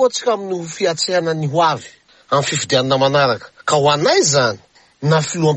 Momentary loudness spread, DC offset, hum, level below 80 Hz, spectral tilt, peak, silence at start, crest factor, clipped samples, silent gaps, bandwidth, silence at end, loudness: 8 LU; under 0.1%; none; -56 dBFS; -4 dB/octave; -2 dBFS; 0 s; 14 dB; under 0.1%; none; 9.8 kHz; 0 s; -16 LUFS